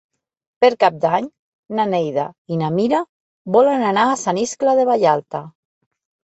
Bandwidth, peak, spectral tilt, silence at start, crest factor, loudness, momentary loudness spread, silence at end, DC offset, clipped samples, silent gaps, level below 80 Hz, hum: 8.2 kHz; -2 dBFS; -5 dB/octave; 0.6 s; 16 dB; -18 LUFS; 12 LU; 0.85 s; under 0.1%; under 0.1%; 1.39-1.63 s, 2.38-2.45 s, 3.09-3.45 s; -64 dBFS; none